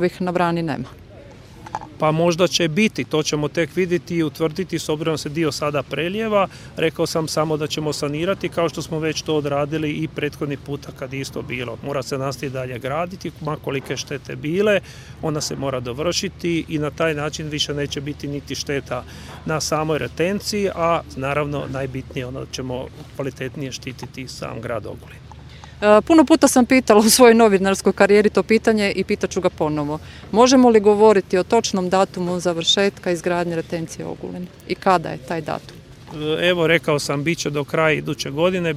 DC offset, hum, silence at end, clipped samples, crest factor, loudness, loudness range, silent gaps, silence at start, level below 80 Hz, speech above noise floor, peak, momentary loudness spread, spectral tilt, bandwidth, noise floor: under 0.1%; none; 0 s; under 0.1%; 20 dB; -20 LUFS; 11 LU; none; 0 s; -46 dBFS; 22 dB; 0 dBFS; 16 LU; -4.5 dB/octave; 16 kHz; -41 dBFS